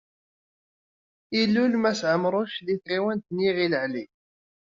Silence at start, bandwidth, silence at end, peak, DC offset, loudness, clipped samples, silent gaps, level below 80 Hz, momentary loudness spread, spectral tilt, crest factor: 1.3 s; 7.6 kHz; 0.65 s; -8 dBFS; under 0.1%; -25 LUFS; under 0.1%; none; -68 dBFS; 8 LU; -4 dB/octave; 18 dB